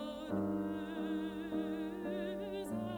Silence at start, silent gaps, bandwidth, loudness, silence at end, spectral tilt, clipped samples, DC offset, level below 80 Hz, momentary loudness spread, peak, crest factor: 0 s; none; 19.5 kHz; -40 LUFS; 0 s; -7 dB/octave; under 0.1%; under 0.1%; -64 dBFS; 3 LU; -26 dBFS; 14 dB